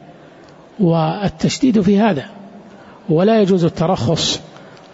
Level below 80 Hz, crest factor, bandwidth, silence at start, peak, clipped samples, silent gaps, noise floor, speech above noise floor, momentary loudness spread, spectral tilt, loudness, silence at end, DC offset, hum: -46 dBFS; 12 dB; 8 kHz; 0.8 s; -4 dBFS; under 0.1%; none; -42 dBFS; 27 dB; 9 LU; -6 dB/octave; -16 LUFS; 0.3 s; under 0.1%; none